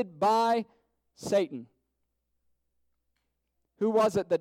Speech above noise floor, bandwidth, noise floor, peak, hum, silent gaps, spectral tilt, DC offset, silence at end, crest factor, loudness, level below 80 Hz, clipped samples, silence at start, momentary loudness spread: 53 dB; 16.5 kHz; -80 dBFS; -16 dBFS; none; none; -5.5 dB/octave; under 0.1%; 0 s; 16 dB; -27 LUFS; -70 dBFS; under 0.1%; 0 s; 17 LU